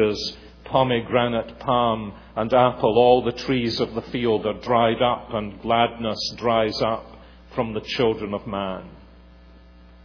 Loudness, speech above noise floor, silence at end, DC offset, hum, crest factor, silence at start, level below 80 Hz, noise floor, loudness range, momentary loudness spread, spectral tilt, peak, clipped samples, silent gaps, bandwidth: -22 LUFS; 26 dB; 1 s; under 0.1%; none; 20 dB; 0 s; -48 dBFS; -48 dBFS; 5 LU; 11 LU; -6 dB/octave; -4 dBFS; under 0.1%; none; 5.4 kHz